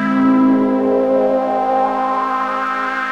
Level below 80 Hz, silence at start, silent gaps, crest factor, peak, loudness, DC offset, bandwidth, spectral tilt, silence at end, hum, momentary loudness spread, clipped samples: -52 dBFS; 0 s; none; 12 dB; -4 dBFS; -16 LUFS; 0.2%; 7 kHz; -7 dB/octave; 0 s; none; 6 LU; under 0.1%